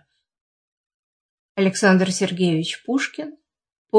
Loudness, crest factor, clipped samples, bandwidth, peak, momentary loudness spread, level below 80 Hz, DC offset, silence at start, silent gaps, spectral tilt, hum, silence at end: -20 LUFS; 22 dB; under 0.1%; 10.5 kHz; -2 dBFS; 16 LU; -70 dBFS; under 0.1%; 1.6 s; 3.78-3.85 s; -5 dB/octave; none; 0 s